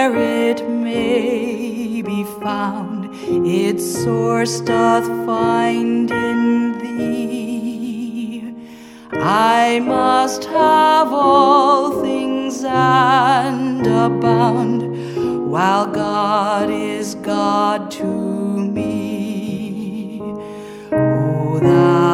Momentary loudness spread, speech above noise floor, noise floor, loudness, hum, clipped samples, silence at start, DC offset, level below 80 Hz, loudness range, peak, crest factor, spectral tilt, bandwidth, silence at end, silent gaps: 12 LU; 21 dB; -37 dBFS; -17 LUFS; none; under 0.1%; 0 s; under 0.1%; -52 dBFS; 7 LU; 0 dBFS; 16 dB; -6 dB/octave; 16 kHz; 0 s; none